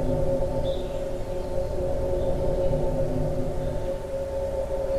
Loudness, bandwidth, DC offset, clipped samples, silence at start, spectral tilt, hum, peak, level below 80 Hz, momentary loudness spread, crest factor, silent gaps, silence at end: -28 LUFS; 13 kHz; under 0.1%; under 0.1%; 0 s; -7.5 dB/octave; none; -12 dBFS; -32 dBFS; 5 LU; 14 dB; none; 0 s